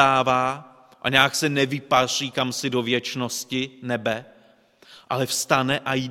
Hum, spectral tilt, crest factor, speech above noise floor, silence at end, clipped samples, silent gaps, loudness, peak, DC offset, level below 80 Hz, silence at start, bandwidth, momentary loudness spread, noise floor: none; -3.5 dB/octave; 24 dB; 33 dB; 0 s; under 0.1%; none; -23 LUFS; 0 dBFS; under 0.1%; -60 dBFS; 0 s; 16.5 kHz; 10 LU; -56 dBFS